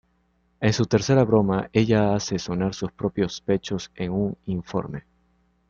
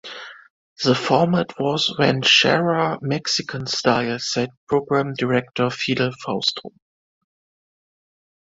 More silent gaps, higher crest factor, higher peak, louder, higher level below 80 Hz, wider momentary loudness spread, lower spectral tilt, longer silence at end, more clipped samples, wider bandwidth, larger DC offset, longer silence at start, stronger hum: second, none vs 0.50-0.76 s, 4.57-4.67 s; about the same, 20 dB vs 20 dB; about the same, -4 dBFS vs -2 dBFS; second, -24 LUFS vs -20 LUFS; first, -50 dBFS vs -60 dBFS; about the same, 10 LU vs 9 LU; first, -6 dB/octave vs -4.5 dB/octave; second, 0.7 s vs 1.8 s; neither; about the same, 7.4 kHz vs 8 kHz; neither; first, 0.6 s vs 0.05 s; neither